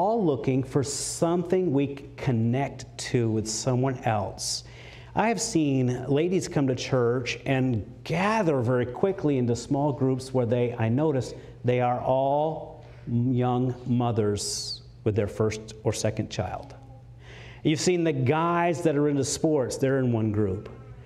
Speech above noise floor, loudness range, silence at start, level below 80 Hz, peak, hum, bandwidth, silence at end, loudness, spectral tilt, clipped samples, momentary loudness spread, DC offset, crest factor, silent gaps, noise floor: 21 dB; 3 LU; 0 s; -54 dBFS; -8 dBFS; none; 13.5 kHz; 0 s; -26 LUFS; -5.5 dB/octave; under 0.1%; 8 LU; under 0.1%; 16 dB; none; -46 dBFS